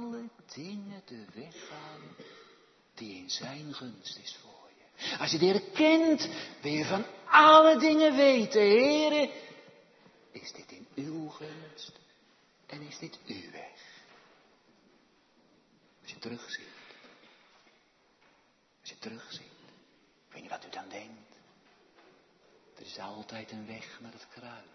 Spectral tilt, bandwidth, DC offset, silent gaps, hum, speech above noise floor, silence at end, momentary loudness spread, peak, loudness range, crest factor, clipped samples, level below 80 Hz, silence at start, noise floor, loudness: -4 dB/octave; 6.4 kHz; under 0.1%; none; none; 40 dB; 0.2 s; 26 LU; -6 dBFS; 26 LU; 24 dB; under 0.1%; -82 dBFS; 0 s; -68 dBFS; -24 LUFS